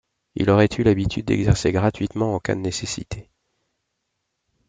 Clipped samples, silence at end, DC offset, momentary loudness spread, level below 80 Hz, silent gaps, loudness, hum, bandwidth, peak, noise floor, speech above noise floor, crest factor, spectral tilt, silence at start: under 0.1%; 1.45 s; under 0.1%; 13 LU; -42 dBFS; none; -21 LUFS; none; 9.4 kHz; -4 dBFS; -77 dBFS; 56 dB; 20 dB; -6 dB/octave; 0.35 s